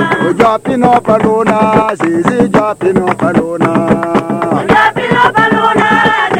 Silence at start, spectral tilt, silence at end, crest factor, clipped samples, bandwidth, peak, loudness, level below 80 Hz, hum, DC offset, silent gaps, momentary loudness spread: 0 s; -6 dB/octave; 0 s; 10 dB; 0.2%; 15.5 kHz; 0 dBFS; -10 LUFS; -40 dBFS; none; under 0.1%; none; 4 LU